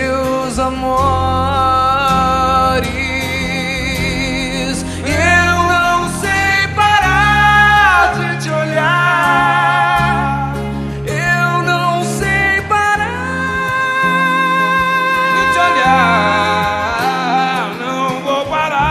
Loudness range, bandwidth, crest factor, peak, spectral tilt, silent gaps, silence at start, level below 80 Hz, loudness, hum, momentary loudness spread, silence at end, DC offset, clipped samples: 4 LU; 14 kHz; 14 dB; 0 dBFS; -4.5 dB/octave; none; 0 s; -32 dBFS; -13 LUFS; none; 7 LU; 0 s; under 0.1%; under 0.1%